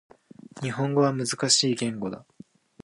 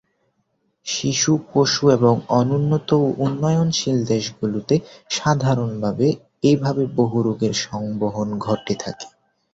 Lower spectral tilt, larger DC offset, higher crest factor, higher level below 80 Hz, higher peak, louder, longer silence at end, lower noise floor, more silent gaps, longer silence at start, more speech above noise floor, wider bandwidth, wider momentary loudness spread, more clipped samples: second, -3.5 dB/octave vs -5.5 dB/octave; neither; about the same, 20 dB vs 18 dB; second, -70 dBFS vs -54 dBFS; second, -6 dBFS vs -2 dBFS; second, -25 LUFS vs -20 LUFS; first, 0.65 s vs 0.45 s; second, -50 dBFS vs -69 dBFS; neither; second, 0.55 s vs 0.85 s; second, 25 dB vs 50 dB; first, 11.5 kHz vs 7.8 kHz; first, 14 LU vs 9 LU; neither